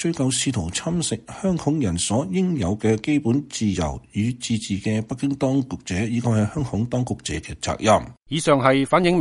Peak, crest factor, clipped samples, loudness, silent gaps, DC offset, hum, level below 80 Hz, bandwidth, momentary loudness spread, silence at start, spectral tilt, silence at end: -2 dBFS; 20 dB; under 0.1%; -22 LUFS; none; under 0.1%; none; -44 dBFS; 11.5 kHz; 8 LU; 0 s; -5 dB/octave; 0 s